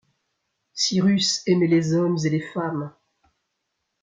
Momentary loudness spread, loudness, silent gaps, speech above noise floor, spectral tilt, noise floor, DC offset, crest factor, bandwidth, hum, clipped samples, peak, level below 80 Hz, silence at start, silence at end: 11 LU; -22 LUFS; none; 57 dB; -5 dB/octave; -78 dBFS; under 0.1%; 16 dB; 9.4 kHz; none; under 0.1%; -8 dBFS; -66 dBFS; 0.75 s; 1.15 s